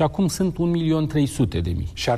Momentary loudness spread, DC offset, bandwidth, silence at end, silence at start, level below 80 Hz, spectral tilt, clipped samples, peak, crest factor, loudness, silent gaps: 5 LU; under 0.1%; 14 kHz; 0 s; 0 s; -40 dBFS; -6.5 dB/octave; under 0.1%; -8 dBFS; 14 dB; -22 LUFS; none